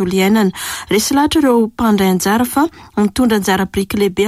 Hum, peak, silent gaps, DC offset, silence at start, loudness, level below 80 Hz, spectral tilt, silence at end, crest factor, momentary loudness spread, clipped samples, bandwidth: none; -4 dBFS; none; under 0.1%; 0 s; -14 LUFS; -40 dBFS; -4.5 dB/octave; 0 s; 10 dB; 5 LU; under 0.1%; 16 kHz